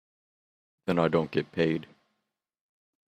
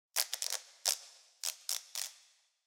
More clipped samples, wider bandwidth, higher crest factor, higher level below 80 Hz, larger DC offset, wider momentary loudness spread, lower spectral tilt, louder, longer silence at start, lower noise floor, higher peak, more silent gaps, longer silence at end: neither; second, 9.2 kHz vs 17 kHz; second, 22 dB vs 32 dB; first, -68 dBFS vs under -90 dBFS; neither; about the same, 9 LU vs 7 LU; first, -8 dB/octave vs 6.5 dB/octave; first, -28 LUFS vs -37 LUFS; first, 0.85 s vs 0.15 s; first, -83 dBFS vs -67 dBFS; about the same, -10 dBFS vs -8 dBFS; neither; first, 1.25 s vs 0.5 s